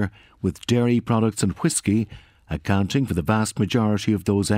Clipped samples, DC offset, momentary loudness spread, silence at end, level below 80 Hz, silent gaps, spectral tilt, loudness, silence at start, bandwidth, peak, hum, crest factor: under 0.1%; under 0.1%; 8 LU; 0 s; -46 dBFS; none; -5.5 dB/octave; -22 LUFS; 0 s; 16 kHz; -6 dBFS; none; 16 dB